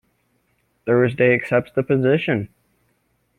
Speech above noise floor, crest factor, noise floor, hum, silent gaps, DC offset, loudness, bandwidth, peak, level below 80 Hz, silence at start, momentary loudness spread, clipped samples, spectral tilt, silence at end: 48 dB; 18 dB; -66 dBFS; none; none; under 0.1%; -19 LUFS; 10 kHz; -2 dBFS; -58 dBFS; 0.85 s; 9 LU; under 0.1%; -8.5 dB/octave; 0.9 s